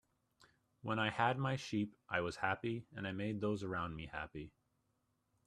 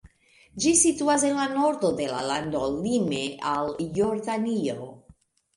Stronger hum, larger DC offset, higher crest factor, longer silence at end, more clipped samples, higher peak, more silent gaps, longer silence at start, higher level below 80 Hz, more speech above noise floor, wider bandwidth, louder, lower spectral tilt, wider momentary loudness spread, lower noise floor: neither; neither; about the same, 24 dB vs 20 dB; first, 0.95 s vs 0.6 s; neither; second, -18 dBFS vs -6 dBFS; neither; first, 0.85 s vs 0.55 s; second, -68 dBFS vs -56 dBFS; first, 42 dB vs 33 dB; about the same, 12 kHz vs 11.5 kHz; second, -40 LUFS vs -25 LUFS; first, -6 dB/octave vs -3.5 dB/octave; about the same, 11 LU vs 9 LU; first, -82 dBFS vs -58 dBFS